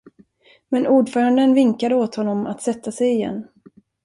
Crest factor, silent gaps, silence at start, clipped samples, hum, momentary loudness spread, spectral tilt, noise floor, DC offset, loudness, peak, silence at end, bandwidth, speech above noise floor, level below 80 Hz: 14 dB; none; 0.7 s; under 0.1%; none; 10 LU; -6 dB/octave; -54 dBFS; under 0.1%; -19 LUFS; -6 dBFS; 0.6 s; 11.5 kHz; 36 dB; -64 dBFS